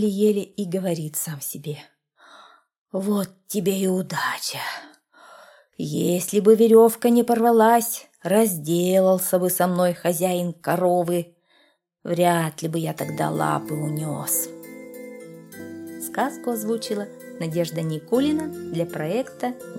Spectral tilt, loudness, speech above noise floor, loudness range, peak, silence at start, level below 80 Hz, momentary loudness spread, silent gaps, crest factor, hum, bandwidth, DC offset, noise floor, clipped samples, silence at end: -5 dB/octave; -22 LUFS; 41 dB; 10 LU; -4 dBFS; 0 s; -68 dBFS; 17 LU; 2.78-2.85 s; 18 dB; none; 17 kHz; under 0.1%; -62 dBFS; under 0.1%; 0 s